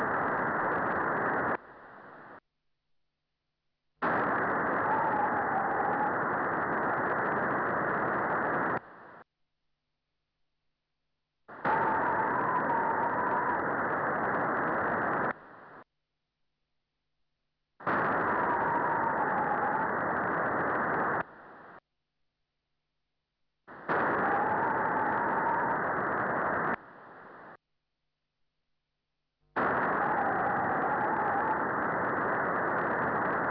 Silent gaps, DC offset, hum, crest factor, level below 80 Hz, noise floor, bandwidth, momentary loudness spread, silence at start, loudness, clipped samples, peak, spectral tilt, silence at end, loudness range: none; under 0.1%; none; 14 dB; -64 dBFS; -85 dBFS; 5.4 kHz; 7 LU; 0 s; -30 LUFS; under 0.1%; -18 dBFS; -9.5 dB/octave; 0 s; 7 LU